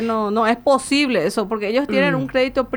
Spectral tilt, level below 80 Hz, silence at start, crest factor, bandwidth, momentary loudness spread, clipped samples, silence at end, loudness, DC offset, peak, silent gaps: -5 dB/octave; -50 dBFS; 0 s; 14 dB; over 20 kHz; 4 LU; under 0.1%; 0 s; -18 LUFS; under 0.1%; -4 dBFS; none